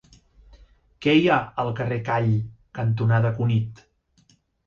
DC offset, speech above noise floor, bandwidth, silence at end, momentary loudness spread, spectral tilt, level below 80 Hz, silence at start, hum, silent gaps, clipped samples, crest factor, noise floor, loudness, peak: under 0.1%; 40 dB; 6.8 kHz; 0.9 s; 9 LU; -8 dB/octave; -54 dBFS; 1 s; none; none; under 0.1%; 18 dB; -62 dBFS; -23 LUFS; -6 dBFS